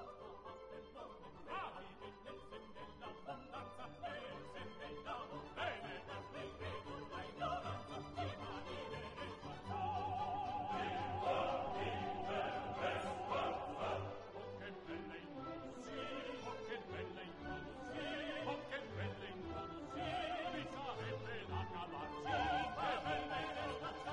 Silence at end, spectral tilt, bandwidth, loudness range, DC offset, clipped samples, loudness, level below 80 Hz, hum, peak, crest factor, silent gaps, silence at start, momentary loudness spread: 0 s; -5.5 dB/octave; 11 kHz; 9 LU; under 0.1%; under 0.1%; -45 LUFS; -66 dBFS; none; -28 dBFS; 18 dB; none; 0 s; 12 LU